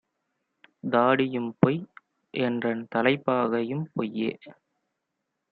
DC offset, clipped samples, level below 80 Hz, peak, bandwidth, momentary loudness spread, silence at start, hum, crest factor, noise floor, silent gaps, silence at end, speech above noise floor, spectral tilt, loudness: under 0.1%; under 0.1%; -68 dBFS; -2 dBFS; 4.8 kHz; 12 LU; 0.85 s; none; 26 dB; -82 dBFS; none; 1 s; 56 dB; -10 dB/octave; -26 LUFS